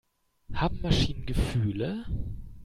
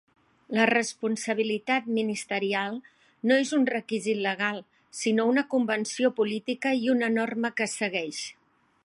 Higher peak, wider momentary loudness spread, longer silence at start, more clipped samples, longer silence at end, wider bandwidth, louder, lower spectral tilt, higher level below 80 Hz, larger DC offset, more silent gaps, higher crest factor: second, -10 dBFS vs -6 dBFS; about the same, 10 LU vs 8 LU; about the same, 0.5 s vs 0.5 s; neither; second, 0 s vs 0.5 s; first, 15.5 kHz vs 11.5 kHz; second, -30 LUFS vs -27 LUFS; first, -6 dB/octave vs -4 dB/octave; first, -36 dBFS vs -80 dBFS; neither; neither; about the same, 20 dB vs 20 dB